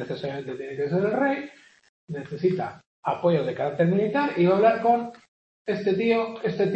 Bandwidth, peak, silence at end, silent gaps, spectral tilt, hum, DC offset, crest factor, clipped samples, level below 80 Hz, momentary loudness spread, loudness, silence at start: 8.2 kHz; -6 dBFS; 0 s; 1.89-2.08 s, 2.86-3.03 s, 5.28-5.65 s; -8 dB/octave; none; under 0.1%; 18 dB; under 0.1%; -68 dBFS; 15 LU; -25 LUFS; 0 s